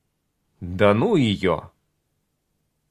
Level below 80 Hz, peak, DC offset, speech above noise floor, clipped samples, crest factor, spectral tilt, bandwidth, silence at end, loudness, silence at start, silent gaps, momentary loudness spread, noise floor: -48 dBFS; -2 dBFS; under 0.1%; 53 dB; under 0.1%; 22 dB; -7 dB/octave; 11.5 kHz; 1.25 s; -20 LUFS; 0.6 s; none; 15 LU; -73 dBFS